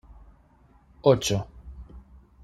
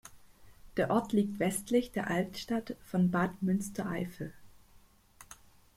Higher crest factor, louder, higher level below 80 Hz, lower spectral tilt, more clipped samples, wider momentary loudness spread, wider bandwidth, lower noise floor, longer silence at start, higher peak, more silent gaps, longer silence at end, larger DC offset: about the same, 24 dB vs 20 dB; first, -24 LUFS vs -33 LUFS; first, -48 dBFS vs -60 dBFS; about the same, -5 dB/octave vs -6 dB/octave; neither; first, 25 LU vs 15 LU; second, 14 kHz vs 16 kHz; about the same, -58 dBFS vs -61 dBFS; first, 1.05 s vs 0.05 s; first, -4 dBFS vs -14 dBFS; neither; about the same, 0.45 s vs 0.45 s; neither